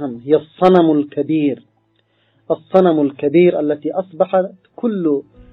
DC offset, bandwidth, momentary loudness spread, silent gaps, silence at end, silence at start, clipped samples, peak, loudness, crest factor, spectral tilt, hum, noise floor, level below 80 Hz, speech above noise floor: under 0.1%; 5.2 kHz; 11 LU; none; 0.3 s; 0 s; under 0.1%; 0 dBFS; -16 LUFS; 16 dB; -9.5 dB/octave; none; -61 dBFS; -56 dBFS; 46 dB